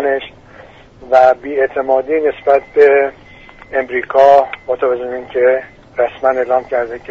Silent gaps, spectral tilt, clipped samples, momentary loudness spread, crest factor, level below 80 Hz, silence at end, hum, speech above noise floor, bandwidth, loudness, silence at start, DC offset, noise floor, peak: none; -5.5 dB/octave; under 0.1%; 11 LU; 14 dB; -50 dBFS; 0.1 s; none; 27 dB; 7.2 kHz; -14 LUFS; 0 s; under 0.1%; -39 dBFS; 0 dBFS